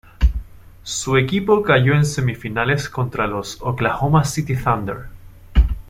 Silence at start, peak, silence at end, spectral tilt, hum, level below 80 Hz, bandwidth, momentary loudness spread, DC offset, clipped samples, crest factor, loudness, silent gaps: 0.2 s; -2 dBFS; 0 s; -5.5 dB/octave; none; -26 dBFS; 16 kHz; 10 LU; under 0.1%; under 0.1%; 16 dB; -19 LUFS; none